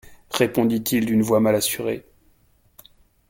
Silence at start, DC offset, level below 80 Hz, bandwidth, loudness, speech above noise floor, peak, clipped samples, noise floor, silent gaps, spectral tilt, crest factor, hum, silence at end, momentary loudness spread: 0.1 s; under 0.1%; -56 dBFS; 17 kHz; -21 LUFS; 39 dB; -4 dBFS; under 0.1%; -59 dBFS; none; -4.5 dB/octave; 20 dB; none; 1.3 s; 11 LU